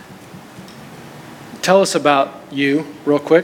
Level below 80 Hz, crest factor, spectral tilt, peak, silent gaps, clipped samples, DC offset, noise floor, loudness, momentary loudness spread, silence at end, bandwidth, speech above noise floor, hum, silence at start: -62 dBFS; 18 dB; -4.5 dB/octave; 0 dBFS; none; under 0.1%; under 0.1%; -38 dBFS; -16 LUFS; 23 LU; 0 s; 17.5 kHz; 23 dB; none; 0.1 s